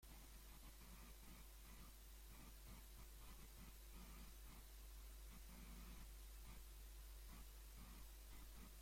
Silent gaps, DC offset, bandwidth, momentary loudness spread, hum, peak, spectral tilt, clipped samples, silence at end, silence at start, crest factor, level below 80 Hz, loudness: none; under 0.1%; 16.5 kHz; 2 LU; none; -48 dBFS; -3.5 dB/octave; under 0.1%; 0 s; 0 s; 12 dB; -60 dBFS; -62 LUFS